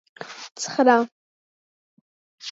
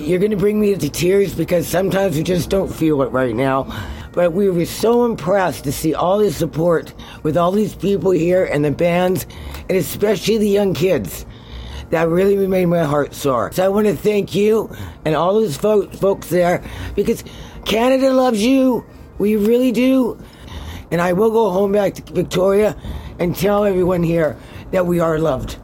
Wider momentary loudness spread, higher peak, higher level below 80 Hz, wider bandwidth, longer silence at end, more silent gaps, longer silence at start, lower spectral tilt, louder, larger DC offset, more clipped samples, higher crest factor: first, 20 LU vs 10 LU; about the same, -4 dBFS vs -4 dBFS; second, -84 dBFS vs -38 dBFS; second, 8 kHz vs 17 kHz; about the same, 0 s vs 0 s; first, 1.12-2.38 s vs none; first, 0.2 s vs 0 s; second, -3 dB/octave vs -6 dB/octave; second, -21 LUFS vs -17 LUFS; neither; neither; first, 22 dB vs 12 dB